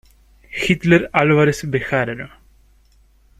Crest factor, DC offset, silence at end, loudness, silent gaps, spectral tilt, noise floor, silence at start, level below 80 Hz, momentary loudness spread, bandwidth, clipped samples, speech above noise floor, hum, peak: 18 dB; under 0.1%; 1.1 s; -17 LUFS; none; -6 dB/octave; -53 dBFS; 0.5 s; -46 dBFS; 17 LU; 13 kHz; under 0.1%; 37 dB; none; 0 dBFS